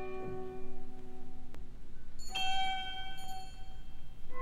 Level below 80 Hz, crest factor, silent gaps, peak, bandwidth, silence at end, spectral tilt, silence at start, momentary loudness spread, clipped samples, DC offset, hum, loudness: -44 dBFS; 12 dB; none; -20 dBFS; 10 kHz; 0 s; -3 dB/octave; 0 s; 20 LU; under 0.1%; under 0.1%; none; -40 LUFS